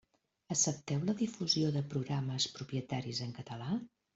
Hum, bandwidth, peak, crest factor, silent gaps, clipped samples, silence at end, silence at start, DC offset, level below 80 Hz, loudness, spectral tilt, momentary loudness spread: none; 8.2 kHz; -18 dBFS; 18 dB; none; under 0.1%; 0.3 s; 0.5 s; under 0.1%; -70 dBFS; -35 LUFS; -4 dB/octave; 8 LU